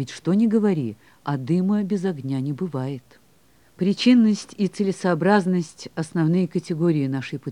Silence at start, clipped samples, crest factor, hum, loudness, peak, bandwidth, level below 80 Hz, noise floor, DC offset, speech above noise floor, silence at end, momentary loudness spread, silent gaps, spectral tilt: 0 s; under 0.1%; 18 dB; none; -22 LUFS; -4 dBFS; 11 kHz; -68 dBFS; -58 dBFS; 0.1%; 37 dB; 0 s; 11 LU; none; -7 dB/octave